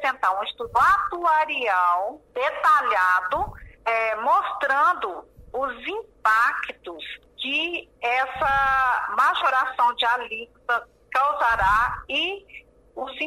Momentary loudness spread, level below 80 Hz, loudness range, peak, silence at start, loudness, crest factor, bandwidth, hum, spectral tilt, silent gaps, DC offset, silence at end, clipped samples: 13 LU; -48 dBFS; 3 LU; -10 dBFS; 0 s; -22 LUFS; 14 dB; 16 kHz; none; -3 dB/octave; none; under 0.1%; 0 s; under 0.1%